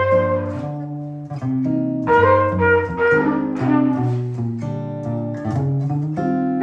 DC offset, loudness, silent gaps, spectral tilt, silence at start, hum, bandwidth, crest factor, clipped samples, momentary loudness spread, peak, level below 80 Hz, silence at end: under 0.1%; -19 LUFS; none; -9.5 dB/octave; 0 s; none; 7.8 kHz; 16 dB; under 0.1%; 11 LU; -2 dBFS; -50 dBFS; 0 s